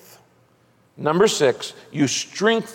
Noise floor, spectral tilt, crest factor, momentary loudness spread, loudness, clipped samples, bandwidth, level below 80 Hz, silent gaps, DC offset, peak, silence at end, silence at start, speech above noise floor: -59 dBFS; -4 dB/octave; 18 dB; 11 LU; -21 LUFS; under 0.1%; 16.5 kHz; -64 dBFS; none; under 0.1%; -4 dBFS; 0 s; 1 s; 38 dB